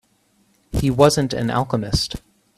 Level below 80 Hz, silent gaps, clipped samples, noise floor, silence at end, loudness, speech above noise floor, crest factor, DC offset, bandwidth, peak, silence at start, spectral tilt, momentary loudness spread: -36 dBFS; none; under 0.1%; -61 dBFS; 0.4 s; -20 LUFS; 43 dB; 20 dB; under 0.1%; 14.5 kHz; 0 dBFS; 0.75 s; -5.5 dB/octave; 12 LU